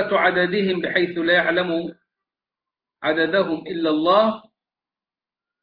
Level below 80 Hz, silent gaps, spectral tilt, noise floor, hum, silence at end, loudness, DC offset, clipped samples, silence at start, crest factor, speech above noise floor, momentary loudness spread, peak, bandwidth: -62 dBFS; none; -8 dB/octave; under -90 dBFS; none; 1.25 s; -20 LUFS; under 0.1%; under 0.1%; 0 s; 16 dB; over 70 dB; 9 LU; -6 dBFS; 5.2 kHz